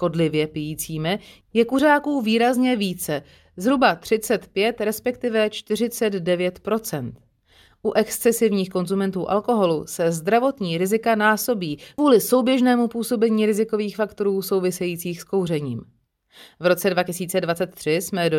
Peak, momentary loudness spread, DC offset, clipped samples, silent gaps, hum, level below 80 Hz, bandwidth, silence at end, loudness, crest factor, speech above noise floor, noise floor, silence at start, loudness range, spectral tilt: -4 dBFS; 8 LU; under 0.1%; under 0.1%; none; none; -58 dBFS; 19 kHz; 0 s; -22 LUFS; 18 dB; 35 dB; -56 dBFS; 0 s; 5 LU; -5 dB/octave